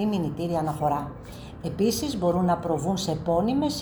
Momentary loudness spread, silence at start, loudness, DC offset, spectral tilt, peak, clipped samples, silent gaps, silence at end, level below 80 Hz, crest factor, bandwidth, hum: 11 LU; 0 s; -26 LUFS; under 0.1%; -6 dB/octave; -12 dBFS; under 0.1%; none; 0 s; -48 dBFS; 14 dB; over 20 kHz; none